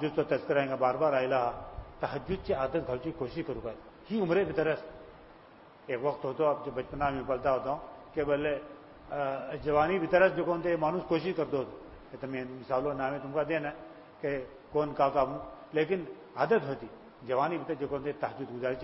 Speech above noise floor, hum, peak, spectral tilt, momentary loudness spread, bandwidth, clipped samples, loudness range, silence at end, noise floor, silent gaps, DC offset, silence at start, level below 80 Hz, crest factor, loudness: 24 dB; none; -10 dBFS; -10 dB/octave; 14 LU; 5.8 kHz; under 0.1%; 4 LU; 0 s; -55 dBFS; none; under 0.1%; 0 s; -56 dBFS; 22 dB; -32 LUFS